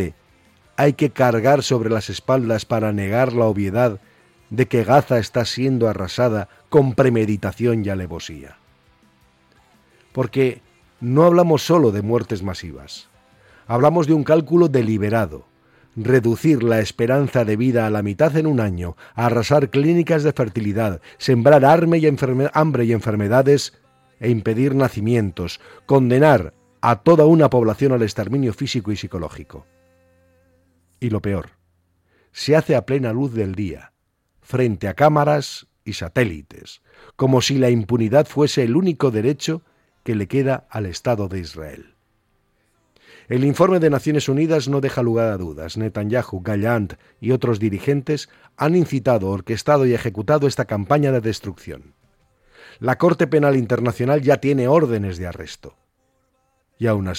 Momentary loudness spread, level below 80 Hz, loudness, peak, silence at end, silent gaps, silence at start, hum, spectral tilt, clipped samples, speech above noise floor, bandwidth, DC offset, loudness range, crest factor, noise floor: 14 LU; -50 dBFS; -18 LUFS; -4 dBFS; 0 s; none; 0 s; none; -7 dB/octave; under 0.1%; 48 dB; 16 kHz; under 0.1%; 7 LU; 16 dB; -66 dBFS